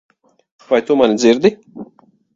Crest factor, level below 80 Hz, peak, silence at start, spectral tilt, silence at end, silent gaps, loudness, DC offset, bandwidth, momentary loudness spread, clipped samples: 16 dB; -58 dBFS; 0 dBFS; 0.7 s; -5 dB/octave; 0.5 s; none; -14 LUFS; under 0.1%; 7.8 kHz; 23 LU; under 0.1%